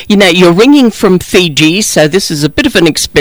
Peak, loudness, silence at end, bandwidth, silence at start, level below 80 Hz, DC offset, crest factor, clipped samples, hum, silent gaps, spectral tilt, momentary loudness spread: 0 dBFS; -7 LUFS; 0 s; over 20 kHz; 0 s; -34 dBFS; under 0.1%; 6 dB; 2%; none; none; -4 dB/octave; 5 LU